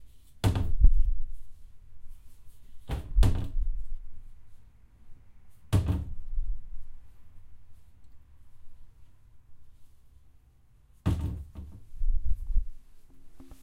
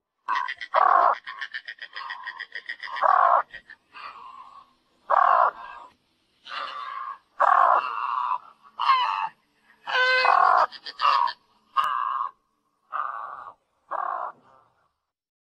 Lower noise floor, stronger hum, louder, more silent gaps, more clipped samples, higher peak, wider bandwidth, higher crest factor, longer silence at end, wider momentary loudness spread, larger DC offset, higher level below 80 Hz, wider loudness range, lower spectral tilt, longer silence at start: second, -59 dBFS vs -73 dBFS; neither; second, -32 LUFS vs -23 LUFS; neither; neither; about the same, -6 dBFS vs -6 dBFS; first, 11.5 kHz vs 9.6 kHz; about the same, 22 dB vs 20 dB; second, 0.1 s vs 1.2 s; first, 24 LU vs 21 LU; neither; first, -32 dBFS vs -76 dBFS; about the same, 8 LU vs 8 LU; first, -7 dB/octave vs -0.5 dB/octave; second, 0 s vs 0.3 s